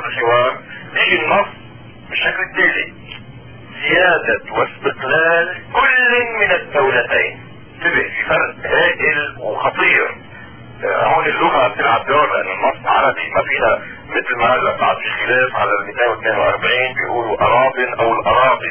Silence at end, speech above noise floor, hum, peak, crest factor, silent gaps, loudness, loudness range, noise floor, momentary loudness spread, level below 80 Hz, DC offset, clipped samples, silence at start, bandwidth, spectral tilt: 0 s; 22 dB; none; -2 dBFS; 16 dB; none; -15 LUFS; 2 LU; -37 dBFS; 9 LU; -48 dBFS; 0.6%; under 0.1%; 0 s; 3.4 kHz; -7 dB/octave